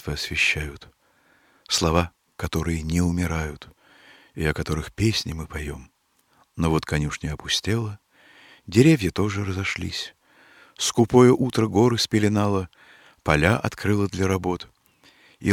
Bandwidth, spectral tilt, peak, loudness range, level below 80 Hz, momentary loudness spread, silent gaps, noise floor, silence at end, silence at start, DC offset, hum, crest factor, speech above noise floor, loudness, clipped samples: 16.5 kHz; -5 dB/octave; -2 dBFS; 7 LU; -40 dBFS; 15 LU; none; -63 dBFS; 0 s; 0.05 s; under 0.1%; none; 22 dB; 41 dB; -23 LUFS; under 0.1%